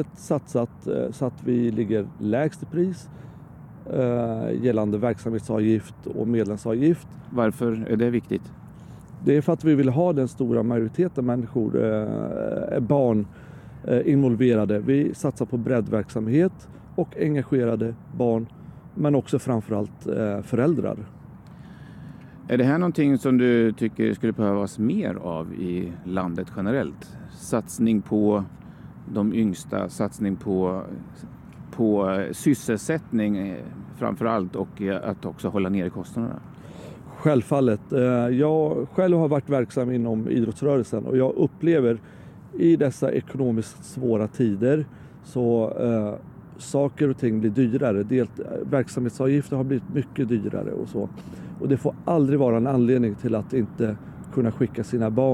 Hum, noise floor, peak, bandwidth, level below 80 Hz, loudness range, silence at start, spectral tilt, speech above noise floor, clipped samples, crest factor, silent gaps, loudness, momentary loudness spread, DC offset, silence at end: none; -43 dBFS; -6 dBFS; 13.5 kHz; -56 dBFS; 4 LU; 0 s; -8 dB/octave; 20 dB; under 0.1%; 18 dB; none; -24 LUFS; 16 LU; under 0.1%; 0 s